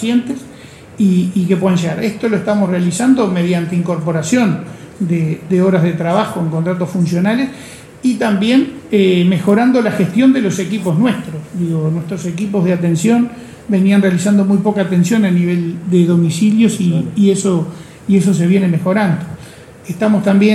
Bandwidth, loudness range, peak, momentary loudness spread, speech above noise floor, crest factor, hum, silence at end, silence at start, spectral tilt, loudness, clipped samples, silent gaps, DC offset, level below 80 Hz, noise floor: 13 kHz; 3 LU; 0 dBFS; 9 LU; 22 dB; 12 dB; none; 0 s; 0 s; -6.5 dB/octave; -14 LUFS; under 0.1%; none; under 0.1%; -52 dBFS; -36 dBFS